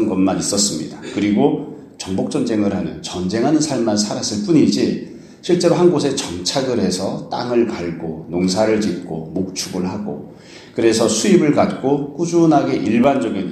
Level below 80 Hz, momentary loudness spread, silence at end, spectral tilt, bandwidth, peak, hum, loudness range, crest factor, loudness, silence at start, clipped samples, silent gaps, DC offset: -52 dBFS; 12 LU; 0 s; -5 dB/octave; 13.5 kHz; 0 dBFS; none; 4 LU; 16 dB; -18 LUFS; 0 s; under 0.1%; none; under 0.1%